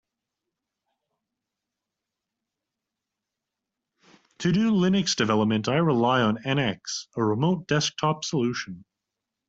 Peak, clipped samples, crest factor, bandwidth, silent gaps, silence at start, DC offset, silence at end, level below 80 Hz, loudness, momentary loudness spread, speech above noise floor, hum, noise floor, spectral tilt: -8 dBFS; under 0.1%; 18 dB; 8 kHz; none; 4.4 s; under 0.1%; 0.7 s; -62 dBFS; -24 LUFS; 9 LU; 62 dB; none; -86 dBFS; -5 dB/octave